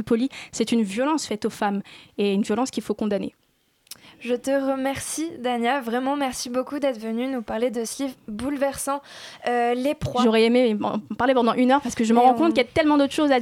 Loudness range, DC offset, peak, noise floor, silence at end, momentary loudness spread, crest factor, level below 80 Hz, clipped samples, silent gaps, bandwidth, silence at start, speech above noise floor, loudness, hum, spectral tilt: 7 LU; under 0.1%; -6 dBFS; -64 dBFS; 0 s; 11 LU; 16 dB; -56 dBFS; under 0.1%; none; 16 kHz; 0 s; 41 dB; -23 LUFS; none; -4.5 dB/octave